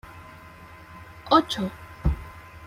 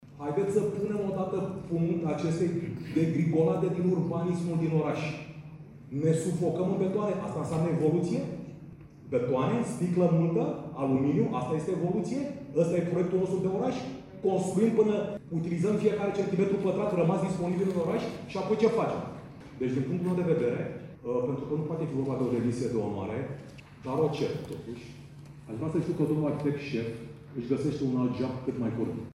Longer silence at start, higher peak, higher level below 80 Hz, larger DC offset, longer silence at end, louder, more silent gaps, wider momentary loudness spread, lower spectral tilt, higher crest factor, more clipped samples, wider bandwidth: about the same, 0.05 s vs 0 s; first, -4 dBFS vs -12 dBFS; first, -38 dBFS vs -60 dBFS; neither; about the same, 0 s vs 0.05 s; first, -25 LUFS vs -29 LUFS; neither; first, 25 LU vs 13 LU; second, -6 dB/octave vs -8 dB/octave; first, 24 dB vs 18 dB; neither; first, 16 kHz vs 11.5 kHz